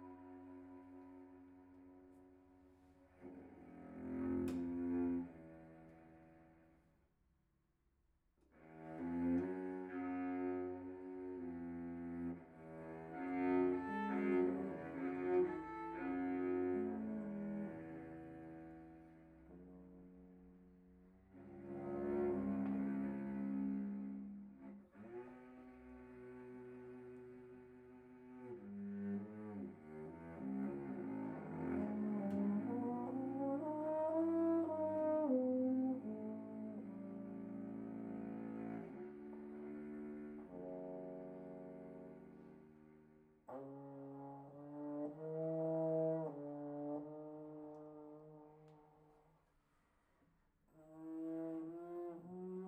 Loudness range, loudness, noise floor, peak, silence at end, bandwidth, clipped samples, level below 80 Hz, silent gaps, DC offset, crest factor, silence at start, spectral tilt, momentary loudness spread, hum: 16 LU; -44 LUFS; -81 dBFS; -26 dBFS; 0 s; 4.3 kHz; under 0.1%; -74 dBFS; none; under 0.1%; 18 dB; 0 s; -10 dB/octave; 22 LU; none